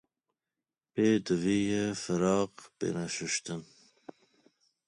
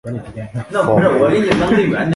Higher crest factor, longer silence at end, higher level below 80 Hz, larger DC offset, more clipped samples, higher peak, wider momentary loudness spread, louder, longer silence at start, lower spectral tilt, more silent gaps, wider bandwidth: about the same, 18 dB vs 14 dB; first, 1.25 s vs 0 s; second, -64 dBFS vs -42 dBFS; neither; neither; second, -14 dBFS vs 0 dBFS; second, 10 LU vs 15 LU; second, -31 LUFS vs -14 LUFS; first, 0.95 s vs 0.05 s; second, -5 dB/octave vs -7 dB/octave; neither; about the same, 11 kHz vs 11.5 kHz